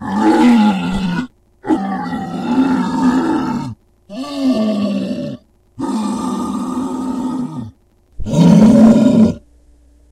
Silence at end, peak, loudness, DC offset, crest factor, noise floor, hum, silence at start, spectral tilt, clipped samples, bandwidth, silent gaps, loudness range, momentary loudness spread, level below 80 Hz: 0.75 s; 0 dBFS; -14 LUFS; under 0.1%; 14 dB; -48 dBFS; none; 0 s; -7 dB/octave; under 0.1%; 11.5 kHz; none; 8 LU; 20 LU; -40 dBFS